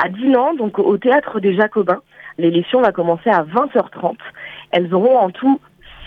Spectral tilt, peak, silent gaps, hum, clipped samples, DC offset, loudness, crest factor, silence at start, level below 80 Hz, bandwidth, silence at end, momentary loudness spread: -8.5 dB/octave; -2 dBFS; none; none; under 0.1%; under 0.1%; -16 LUFS; 16 dB; 0 s; -58 dBFS; 4.7 kHz; 0 s; 9 LU